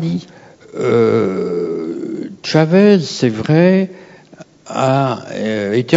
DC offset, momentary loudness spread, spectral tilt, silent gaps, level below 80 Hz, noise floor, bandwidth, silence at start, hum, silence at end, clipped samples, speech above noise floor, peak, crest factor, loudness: under 0.1%; 14 LU; -7 dB/octave; none; -58 dBFS; -41 dBFS; 7.8 kHz; 0 s; none; 0 s; under 0.1%; 27 dB; 0 dBFS; 16 dB; -15 LUFS